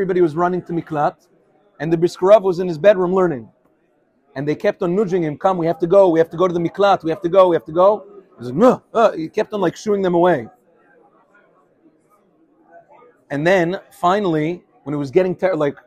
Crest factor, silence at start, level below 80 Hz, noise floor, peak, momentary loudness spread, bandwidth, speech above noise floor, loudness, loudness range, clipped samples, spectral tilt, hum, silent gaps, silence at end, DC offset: 18 dB; 0 s; -60 dBFS; -61 dBFS; 0 dBFS; 11 LU; 12 kHz; 45 dB; -17 LUFS; 7 LU; under 0.1%; -7 dB/octave; none; none; 0.15 s; under 0.1%